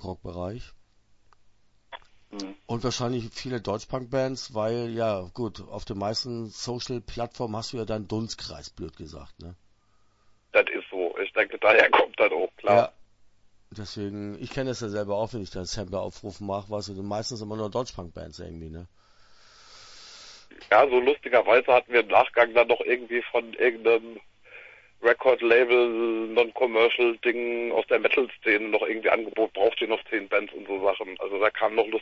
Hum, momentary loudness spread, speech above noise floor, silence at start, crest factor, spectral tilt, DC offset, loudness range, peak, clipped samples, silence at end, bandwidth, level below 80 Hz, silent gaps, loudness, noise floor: none; 20 LU; 38 dB; 0 s; 22 dB; -5 dB/octave; under 0.1%; 12 LU; -4 dBFS; under 0.1%; 0 s; 8 kHz; -54 dBFS; none; -25 LUFS; -63 dBFS